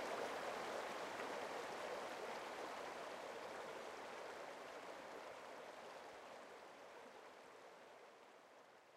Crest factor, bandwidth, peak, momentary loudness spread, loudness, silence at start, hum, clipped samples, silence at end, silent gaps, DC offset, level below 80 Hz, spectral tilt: 18 dB; 16 kHz; -34 dBFS; 14 LU; -51 LUFS; 0 s; none; under 0.1%; 0 s; none; under 0.1%; -88 dBFS; -2.5 dB/octave